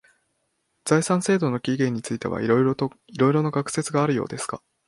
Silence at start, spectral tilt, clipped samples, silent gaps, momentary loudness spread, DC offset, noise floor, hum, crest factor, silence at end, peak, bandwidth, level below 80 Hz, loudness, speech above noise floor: 0.85 s; -6 dB/octave; under 0.1%; none; 9 LU; under 0.1%; -73 dBFS; none; 20 dB; 0.3 s; -4 dBFS; 11.5 kHz; -60 dBFS; -23 LUFS; 50 dB